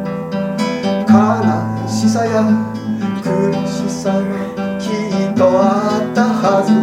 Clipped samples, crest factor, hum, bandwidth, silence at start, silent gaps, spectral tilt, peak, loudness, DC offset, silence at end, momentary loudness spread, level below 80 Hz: under 0.1%; 14 dB; none; 12 kHz; 0 s; none; -6.5 dB/octave; 0 dBFS; -16 LUFS; under 0.1%; 0 s; 9 LU; -52 dBFS